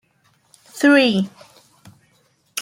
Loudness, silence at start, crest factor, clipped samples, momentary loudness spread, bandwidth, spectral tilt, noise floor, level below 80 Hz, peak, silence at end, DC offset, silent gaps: -16 LUFS; 0.75 s; 18 dB; under 0.1%; 18 LU; 16.5 kHz; -4.5 dB/octave; -61 dBFS; -68 dBFS; -2 dBFS; 0 s; under 0.1%; none